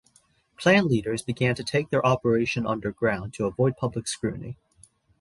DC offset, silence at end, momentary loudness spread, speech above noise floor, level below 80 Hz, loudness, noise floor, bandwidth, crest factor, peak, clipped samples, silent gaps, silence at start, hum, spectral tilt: under 0.1%; 0.65 s; 10 LU; 39 dB; -54 dBFS; -25 LUFS; -63 dBFS; 11.5 kHz; 20 dB; -6 dBFS; under 0.1%; none; 0.6 s; none; -5.5 dB/octave